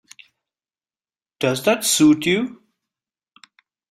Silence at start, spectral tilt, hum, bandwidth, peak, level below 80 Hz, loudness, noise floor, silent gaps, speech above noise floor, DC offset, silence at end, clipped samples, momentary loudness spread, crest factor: 1.4 s; -3.5 dB/octave; none; 16 kHz; -4 dBFS; -64 dBFS; -18 LUFS; under -90 dBFS; none; over 72 dB; under 0.1%; 1.35 s; under 0.1%; 9 LU; 18 dB